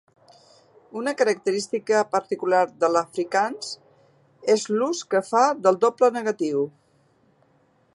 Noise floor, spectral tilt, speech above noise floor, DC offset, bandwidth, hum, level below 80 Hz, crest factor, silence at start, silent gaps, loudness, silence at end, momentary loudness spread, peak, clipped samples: -62 dBFS; -4 dB/octave; 40 dB; under 0.1%; 11.5 kHz; none; -78 dBFS; 20 dB; 0.95 s; none; -23 LUFS; 1.25 s; 11 LU; -4 dBFS; under 0.1%